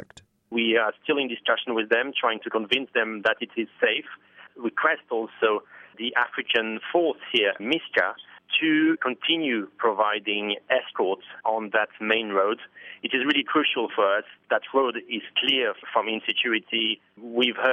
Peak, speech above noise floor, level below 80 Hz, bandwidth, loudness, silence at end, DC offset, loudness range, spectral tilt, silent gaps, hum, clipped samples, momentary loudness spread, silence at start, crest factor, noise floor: -6 dBFS; 25 dB; -76 dBFS; 7.8 kHz; -25 LUFS; 0 s; under 0.1%; 2 LU; -5 dB/octave; none; none; under 0.1%; 7 LU; 0.5 s; 20 dB; -51 dBFS